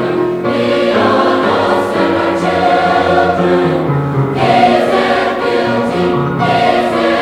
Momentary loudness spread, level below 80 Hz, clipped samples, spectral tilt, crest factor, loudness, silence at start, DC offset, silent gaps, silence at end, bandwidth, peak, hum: 4 LU; -44 dBFS; under 0.1%; -6.5 dB/octave; 12 dB; -12 LUFS; 0 s; under 0.1%; none; 0 s; 13 kHz; 0 dBFS; none